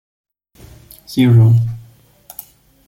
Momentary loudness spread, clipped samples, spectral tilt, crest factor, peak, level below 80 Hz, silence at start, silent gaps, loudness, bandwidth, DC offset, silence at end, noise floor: 24 LU; under 0.1%; -8 dB/octave; 14 dB; -2 dBFS; -48 dBFS; 1.1 s; none; -13 LUFS; 16.5 kHz; under 0.1%; 1.1 s; -45 dBFS